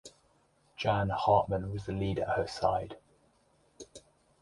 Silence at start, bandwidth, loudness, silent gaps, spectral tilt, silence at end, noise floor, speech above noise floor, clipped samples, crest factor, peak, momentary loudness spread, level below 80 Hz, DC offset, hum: 0.05 s; 11.5 kHz; -31 LUFS; none; -6.5 dB/octave; 0.4 s; -69 dBFS; 38 dB; under 0.1%; 22 dB; -12 dBFS; 24 LU; -54 dBFS; under 0.1%; none